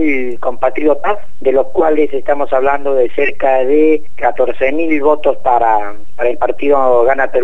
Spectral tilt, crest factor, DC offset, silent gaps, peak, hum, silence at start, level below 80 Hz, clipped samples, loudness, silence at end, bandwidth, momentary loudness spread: -7.5 dB/octave; 14 dB; 20%; none; 0 dBFS; none; 0 s; -42 dBFS; under 0.1%; -14 LUFS; 0 s; 7.6 kHz; 6 LU